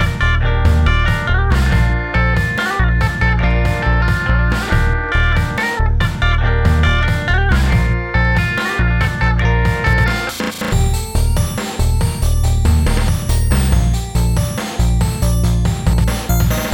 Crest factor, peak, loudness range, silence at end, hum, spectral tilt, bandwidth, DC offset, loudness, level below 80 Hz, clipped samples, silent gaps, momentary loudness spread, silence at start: 14 dB; 0 dBFS; 1 LU; 0 s; none; -5.5 dB/octave; 20 kHz; under 0.1%; -16 LUFS; -16 dBFS; under 0.1%; none; 3 LU; 0 s